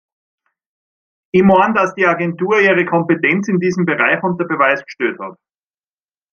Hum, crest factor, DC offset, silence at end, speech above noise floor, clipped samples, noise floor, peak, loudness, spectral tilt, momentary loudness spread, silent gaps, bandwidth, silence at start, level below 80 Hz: none; 16 dB; under 0.1%; 1 s; over 75 dB; under 0.1%; under -90 dBFS; 0 dBFS; -14 LUFS; -7 dB/octave; 9 LU; none; 7 kHz; 1.35 s; -56 dBFS